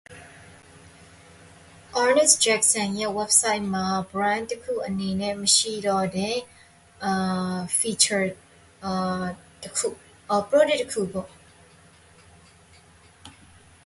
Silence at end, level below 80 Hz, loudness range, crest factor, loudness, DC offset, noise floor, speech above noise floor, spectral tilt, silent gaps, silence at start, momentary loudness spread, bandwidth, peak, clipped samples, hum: 0.55 s; -58 dBFS; 6 LU; 24 dB; -23 LUFS; under 0.1%; -53 dBFS; 30 dB; -2.5 dB/octave; none; 0.1 s; 12 LU; 12 kHz; -2 dBFS; under 0.1%; none